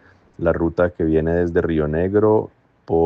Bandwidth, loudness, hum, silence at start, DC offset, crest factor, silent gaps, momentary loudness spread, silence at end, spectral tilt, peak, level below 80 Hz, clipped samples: 5.2 kHz; -19 LUFS; none; 0.4 s; under 0.1%; 16 dB; none; 6 LU; 0 s; -10 dB/octave; -4 dBFS; -40 dBFS; under 0.1%